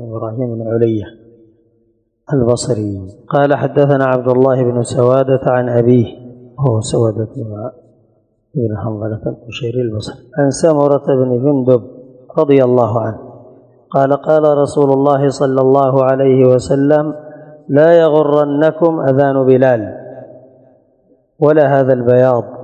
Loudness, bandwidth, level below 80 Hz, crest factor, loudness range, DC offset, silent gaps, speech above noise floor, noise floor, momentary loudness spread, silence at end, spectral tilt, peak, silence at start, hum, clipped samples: -13 LUFS; 9.8 kHz; -48 dBFS; 14 dB; 7 LU; under 0.1%; none; 47 dB; -59 dBFS; 13 LU; 0 s; -7.5 dB/octave; 0 dBFS; 0 s; none; 0.2%